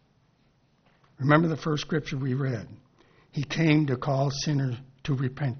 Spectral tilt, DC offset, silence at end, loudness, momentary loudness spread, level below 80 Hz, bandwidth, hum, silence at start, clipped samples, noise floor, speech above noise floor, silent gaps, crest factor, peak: -6 dB/octave; under 0.1%; 0 s; -27 LUFS; 13 LU; -56 dBFS; 6.6 kHz; none; 1.2 s; under 0.1%; -65 dBFS; 40 dB; none; 22 dB; -4 dBFS